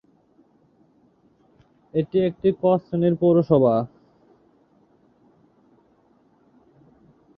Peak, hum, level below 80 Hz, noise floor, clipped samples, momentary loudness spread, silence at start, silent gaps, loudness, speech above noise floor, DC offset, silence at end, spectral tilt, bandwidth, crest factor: -4 dBFS; none; -62 dBFS; -60 dBFS; under 0.1%; 9 LU; 1.95 s; none; -21 LUFS; 41 dB; under 0.1%; 3.5 s; -11.5 dB/octave; 5.6 kHz; 22 dB